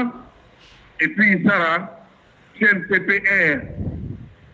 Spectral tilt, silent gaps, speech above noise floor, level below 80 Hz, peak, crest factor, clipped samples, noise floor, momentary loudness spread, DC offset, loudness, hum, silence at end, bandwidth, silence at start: -7.5 dB/octave; none; 33 dB; -48 dBFS; -4 dBFS; 16 dB; under 0.1%; -51 dBFS; 17 LU; under 0.1%; -18 LUFS; none; 0.25 s; 7.6 kHz; 0 s